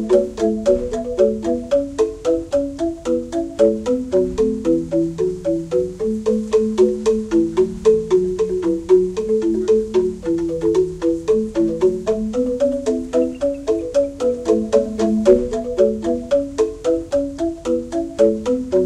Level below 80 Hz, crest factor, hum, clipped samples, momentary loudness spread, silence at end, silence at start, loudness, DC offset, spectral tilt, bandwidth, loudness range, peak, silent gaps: -40 dBFS; 18 dB; none; under 0.1%; 6 LU; 0 s; 0 s; -19 LUFS; under 0.1%; -6.5 dB/octave; 11 kHz; 2 LU; 0 dBFS; none